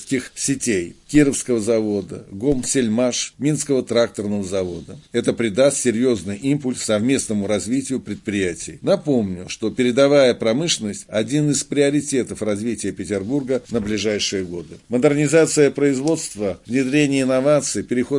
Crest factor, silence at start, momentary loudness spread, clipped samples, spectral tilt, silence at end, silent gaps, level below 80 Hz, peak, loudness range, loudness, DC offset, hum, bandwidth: 18 dB; 0 s; 9 LU; under 0.1%; -4.5 dB/octave; 0 s; none; -50 dBFS; -2 dBFS; 3 LU; -20 LUFS; under 0.1%; none; 11.5 kHz